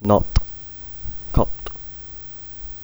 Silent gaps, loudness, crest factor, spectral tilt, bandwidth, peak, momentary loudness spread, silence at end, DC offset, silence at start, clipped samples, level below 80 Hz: none; -26 LUFS; 22 dB; -7.5 dB/octave; over 20 kHz; 0 dBFS; 14 LU; 0 s; under 0.1%; 0 s; under 0.1%; -28 dBFS